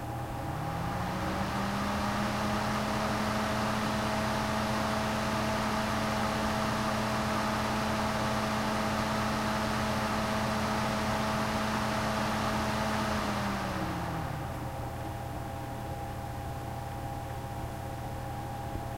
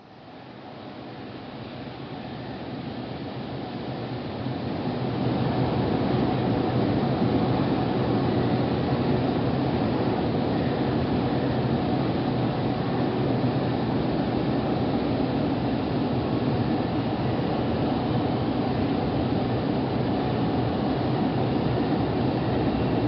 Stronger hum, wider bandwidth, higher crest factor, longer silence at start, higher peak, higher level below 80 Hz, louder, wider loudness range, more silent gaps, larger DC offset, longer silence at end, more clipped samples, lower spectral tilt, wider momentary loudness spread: neither; first, 16 kHz vs 5.8 kHz; about the same, 14 dB vs 14 dB; about the same, 0 s vs 0 s; second, -18 dBFS vs -12 dBFS; about the same, -46 dBFS vs -44 dBFS; second, -32 LUFS vs -26 LUFS; about the same, 8 LU vs 8 LU; neither; first, 0.1% vs under 0.1%; about the same, 0 s vs 0 s; neither; second, -5 dB/octave vs -6.5 dB/octave; second, 8 LU vs 11 LU